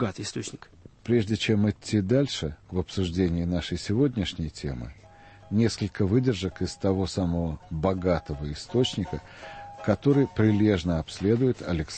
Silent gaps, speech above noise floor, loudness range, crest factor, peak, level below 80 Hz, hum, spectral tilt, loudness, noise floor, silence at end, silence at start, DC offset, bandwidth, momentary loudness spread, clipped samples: none; 24 dB; 3 LU; 18 dB; -8 dBFS; -44 dBFS; none; -6.5 dB/octave; -27 LUFS; -50 dBFS; 0 s; 0 s; under 0.1%; 8.8 kHz; 12 LU; under 0.1%